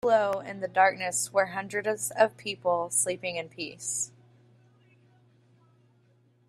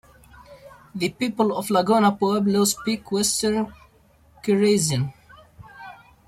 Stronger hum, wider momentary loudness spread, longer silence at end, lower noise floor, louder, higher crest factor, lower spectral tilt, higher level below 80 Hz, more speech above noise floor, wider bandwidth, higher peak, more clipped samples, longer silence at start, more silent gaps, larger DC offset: neither; second, 10 LU vs 17 LU; first, 2.4 s vs 0.35 s; first, -64 dBFS vs -56 dBFS; second, -28 LUFS vs -22 LUFS; first, 22 dB vs 16 dB; second, -2 dB/octave vs -4.5 dB/octave; second, -74 dBFS vs -56 dBFS; about the same, 36 dB vs 35 dB; second, 14.5 kHz vs 16 kHz; about the same, -8 dBFS vs -6 dBFS; neither; second, 0.05 s vs 0.5 s; neither; neither